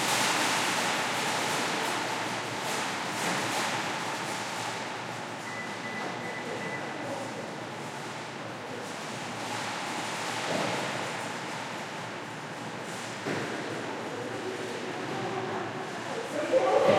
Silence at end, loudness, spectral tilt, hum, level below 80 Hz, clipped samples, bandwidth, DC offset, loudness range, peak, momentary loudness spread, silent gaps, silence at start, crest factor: 0 s; -32 LUFS; -3 dB/octave; none; -74 dBFS; under 0.1%; 16.5 kHz; under 0.1%; 6 LU; -10 dBFS; 11 LU; none; 0 s; 22 dB